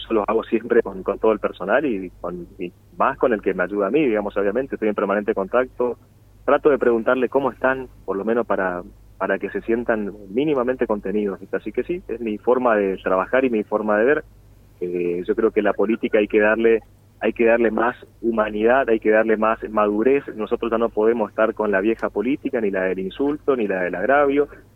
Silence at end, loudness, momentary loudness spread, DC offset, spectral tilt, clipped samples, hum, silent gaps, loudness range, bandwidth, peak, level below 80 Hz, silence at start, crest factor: 0.15 s; -21 LUFS; 9 LU; under 0.1%; -8 dB/octave; under 0.1%; none; none; 4 LU; 4.1 kHz; -4 dBFS; -50 dBFS; 0 s; 18 dB